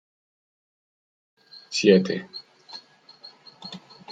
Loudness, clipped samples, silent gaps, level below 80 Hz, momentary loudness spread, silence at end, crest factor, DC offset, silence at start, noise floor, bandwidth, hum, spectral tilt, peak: -21 LUFS; under 0.1%; none; -72 dBFS; 27 LU; 0 s; 24 dB; under 0.1%; 1.7 s; -50 dBFS; 9.2 kHz; none; -5 dB/octave; -4 dBFS